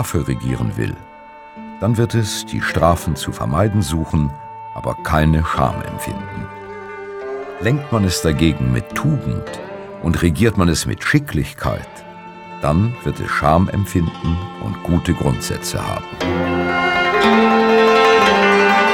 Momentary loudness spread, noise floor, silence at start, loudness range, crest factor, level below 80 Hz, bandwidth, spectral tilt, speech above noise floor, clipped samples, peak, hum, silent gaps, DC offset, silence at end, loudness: 18 LU; -38 dBFS; 0 s; 5 LU; 18 dB; -32 dBFS; 17.5 kHz; -5.5 dB/octave; 20 dB; under 0.1%; 0 dBFS; none; none; under 0.1%; 0 s; -17 LUFS